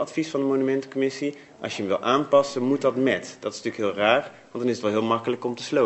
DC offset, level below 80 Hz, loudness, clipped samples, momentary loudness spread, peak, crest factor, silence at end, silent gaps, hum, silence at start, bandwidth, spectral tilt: under 0.1%; -72 dBFS; -24 LUFS; under 0.1%; 10 LU; -4 dBFS; 20 dB; 0 s; none; none; 0 s; 8.4 kHz; -5 dB/octave